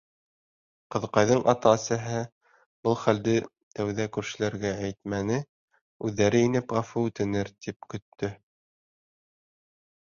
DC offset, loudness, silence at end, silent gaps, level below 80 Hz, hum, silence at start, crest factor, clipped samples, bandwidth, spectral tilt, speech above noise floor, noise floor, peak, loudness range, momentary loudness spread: under 0.1%; -27 LUFS; 1.75 s; 2.32-2.41 s, 2.66-2.83 s, 3.63-3.71 s, 5.49-5.68 s, 5.81-6.00 s, 7.76-7.80 s, 8.02-8.12 s; -58 dBFS; none; 0.9 s; 22 dB; under 0.1%; 7.4 kHz; -5.5 dB/octave; over 64 dB; under -90 dBFS; -6 dBFS; 4 LU; 13 LU